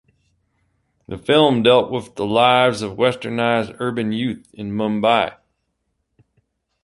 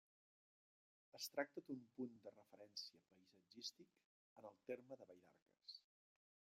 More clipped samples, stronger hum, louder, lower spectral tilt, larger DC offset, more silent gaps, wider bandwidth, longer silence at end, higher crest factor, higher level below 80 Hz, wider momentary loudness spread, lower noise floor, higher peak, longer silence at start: neither; neither; first, -18 LUFS vs -55 LUFS; first, -5.5 dB/octave vs -3 dB/octave; neither; second, none vs 4.05-4.36 s, 5.42-5.46 s; second, 11.5 kHz vs 15 kHz; first, 1.5 s vs 0.75 s; second, 18 dB vs 28 dB; first, -54 dBFS vs under -90 dBFS; second, 12 LU vs 15 LU; second, -72 dBFS vs under -90 dBFS; first, -2 dBFS vs -30 dBFS; about the same, 1.1 s vs 1.15 s